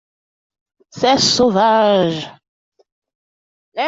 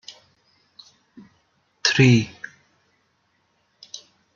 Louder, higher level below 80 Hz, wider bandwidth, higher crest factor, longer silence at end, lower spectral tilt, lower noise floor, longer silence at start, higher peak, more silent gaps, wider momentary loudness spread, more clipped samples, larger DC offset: first, -14 LUFS vs -18 LUFS; first, -54 dBFS vs -62 dBFS; about the same, 7.8 kHz vs 7.4 kHz; second, 16 dB vs 22 dB; second, 0 s vs 0.4 s; second, -3.5 dB/octave vs -5 dB/octave; first, under -90 dBFS vs -68 dBFS; second, 0.95 s vs 1.85 s; about the same, -2 dBFS vs -4 dBFS; first, 2.48-2.72 s, 2.92-3.02 s, 3.15-3.72 s vs none; second, 16 LU vs 25 LU; neither; neither